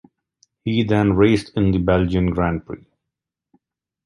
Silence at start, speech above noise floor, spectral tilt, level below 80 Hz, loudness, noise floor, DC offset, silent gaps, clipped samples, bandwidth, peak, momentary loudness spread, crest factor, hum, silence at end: 0.65 s; 66 dB; -8 dB/octave; -36 dBFS; -19 LUFS; -84 dBFS; under 0.1%; none; under 0.1%; 11 kHz; -2 dBFS; 14 LU; 18 dB; none; 1.3 s